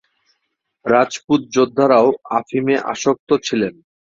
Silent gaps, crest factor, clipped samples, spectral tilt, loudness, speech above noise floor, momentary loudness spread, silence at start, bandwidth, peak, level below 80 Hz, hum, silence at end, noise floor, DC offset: 1.24-1.28 s, 3.19-3.27 s; 16 dB; under 0.1%; -5 dB/octave; -17 LUFS; 57 dB; 8 LU; 0.85 s; 7.6 kHz; -2 dBFS; -60 dBFS; none; 0.4 s; -73 dBFS; under 0.1%